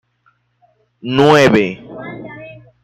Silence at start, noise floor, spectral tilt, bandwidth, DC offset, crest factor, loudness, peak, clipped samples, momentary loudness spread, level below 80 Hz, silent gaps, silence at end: 1.05 s; -59 dBFS; -6 dB/octave; 14.5 kHz; under 0.1%; 16 dB; -12 LUFS; 0 dBFS; under 0.1%; 23 LU; -52 dBFS; none; 0.3 s